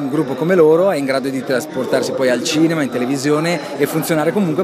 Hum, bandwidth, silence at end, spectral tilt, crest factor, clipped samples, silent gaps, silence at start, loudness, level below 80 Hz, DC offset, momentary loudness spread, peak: none; 15.5 kHz; 0 s; -5 dB/octave; 14 dB; under 0.1%; none; 0 s; -16 LUFS; -64 dBFS; under 0.1%; 7 LU; -2 dBFS